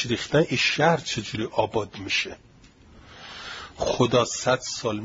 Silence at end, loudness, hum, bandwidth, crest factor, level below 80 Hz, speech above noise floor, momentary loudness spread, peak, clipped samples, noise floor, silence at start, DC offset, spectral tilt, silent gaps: 0 s; -24 LUFS; none; 7.8 kHz; 20 dB; -52 dBFS; 28 dB; 16 LU; -6 dBFS; under 0.1%; -52 dBFS; 0 s; under 0.1%; -4 dB/octave; none